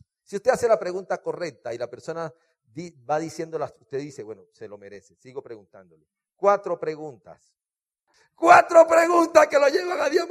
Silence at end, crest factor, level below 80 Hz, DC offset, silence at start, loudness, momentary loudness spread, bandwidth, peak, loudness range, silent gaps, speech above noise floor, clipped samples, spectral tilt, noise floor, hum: 0 s; 22 dB; -68 dBFS; under 0.1%; 0.3 s; -21 LUFS; 25 LU; 14.5 kHz; 0 dBFS; 15 LU; none; 61 dB; under 0.1%; -4 dB/octave; -84 dBFS; none